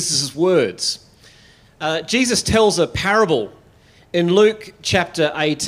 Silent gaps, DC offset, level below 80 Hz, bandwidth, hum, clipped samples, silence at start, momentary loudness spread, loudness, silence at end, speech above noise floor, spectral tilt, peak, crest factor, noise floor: none; under 0.1%; -46 dBFS; 16 kHz; none; under 0.1%; 0 s; 9 LU; -18 LUFS; 0 s; 33 dB; -3.5 dB/octave; -2 dBFS; 16 dB; -50 dBFS